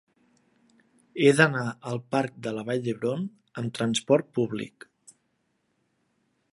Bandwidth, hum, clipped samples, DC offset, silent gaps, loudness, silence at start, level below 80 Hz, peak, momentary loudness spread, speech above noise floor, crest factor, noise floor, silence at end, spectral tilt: 11.5 kHz; none; under 0.1%; under 0.1%; none; -26 LUFS; 1.15 s; -72 dBFS; -2 dBFS; 14 LU; 48 dB; 26 dB; -74 dBFS; 1.85 s; -5.5 dB/octave